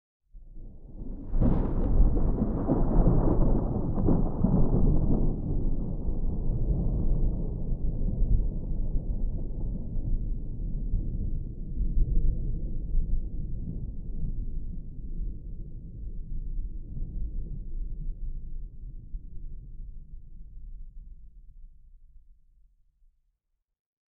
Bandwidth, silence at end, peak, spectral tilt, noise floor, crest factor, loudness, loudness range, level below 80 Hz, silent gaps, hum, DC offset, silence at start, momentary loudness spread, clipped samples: 1.7 kHz; 1.85 s; -10 dBFS; -14 dB/octave; -79 dBFS; 18 dB; -32 LUFS; 17 LU; -28 dBFS; none; none; under 0.1%; 0.35 s; 20 LU; under 0.1%